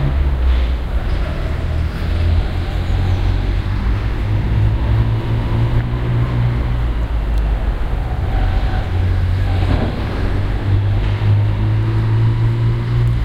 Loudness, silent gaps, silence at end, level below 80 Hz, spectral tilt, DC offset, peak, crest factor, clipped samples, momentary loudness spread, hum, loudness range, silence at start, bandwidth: -18 LUFS; none; 0 s; -18 dBFS; -8 dB/octave; under 0.1%; -2 dBFS; 14 dB; under 0.1%; 5 LU; none; 2 LU; 0 s; 6.8 kHz